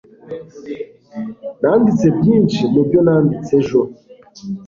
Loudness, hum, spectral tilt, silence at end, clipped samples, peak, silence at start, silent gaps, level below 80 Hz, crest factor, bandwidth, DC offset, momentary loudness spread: -14 LUFS; none; -8.5 dB/octave; 0 s; under 0.1%; -2 dBFS; 0.25 s; none; -50 dBFS; 14 dB; 7.4 kHz; under 0.1%; 18 LU